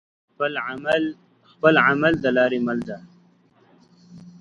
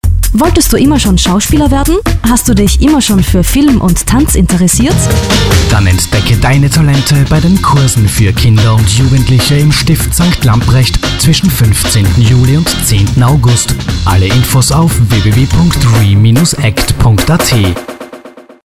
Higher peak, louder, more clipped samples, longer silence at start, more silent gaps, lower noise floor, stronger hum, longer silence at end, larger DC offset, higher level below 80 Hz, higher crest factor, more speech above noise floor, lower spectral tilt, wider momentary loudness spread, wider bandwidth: about the same, 0 dBFS vs 0 dBFS; second, -21 LUFS vs -8 LUFS; neither; first, 0.4 s vs 0.05 s; neither; first, -57 dBFS vs -31 dBFS; neither; about the same, 0.1 s vs 0.15 s; second, under 0.1% vs 2%; second, -58 dBFS vs -16 dBFS; first, 22 dB vs 8 dB; first, 37 dB vs 24 dB; first, -7 dB/octave vs -5 dB/octave; first, 13 LU vs 3 LU; second, 10.5 kHz vs 16 kHz